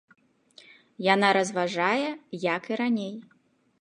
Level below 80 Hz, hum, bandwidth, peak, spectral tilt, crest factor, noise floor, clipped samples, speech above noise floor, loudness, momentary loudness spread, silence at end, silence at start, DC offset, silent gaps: -80 dBFS; none; 10.5 kHz; -6 dBFS; -4.5 dB/octave; 22 dB; -56 dBFS; under 0.1%; 31 dB; -26 LUFS; 11 LU; 0.6 s; 1 s; under 0.1%; none